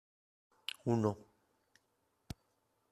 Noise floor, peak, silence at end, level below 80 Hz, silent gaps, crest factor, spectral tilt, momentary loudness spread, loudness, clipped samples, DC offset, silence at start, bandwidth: -80 dBFS; -18 dBFS; 1.7 s; -68 dBFS; none; 24 dB; -6.5 dB/octave; 19 LU; -37 LUFS; under 0.1%; under 0.1%; 0.85 s; 14 kHz